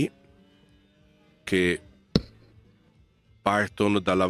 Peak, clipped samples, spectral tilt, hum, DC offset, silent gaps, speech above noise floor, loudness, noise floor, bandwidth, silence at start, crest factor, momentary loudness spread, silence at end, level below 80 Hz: -2 dBFS; under 0.1%; -5.5 dB/octave; none; under 0.1%; none; 37 dB; -26 LUFS; -61 dBFS; 14 kHz; 0 s; 26 dB; 7 LU; 0 s; -52 dBFS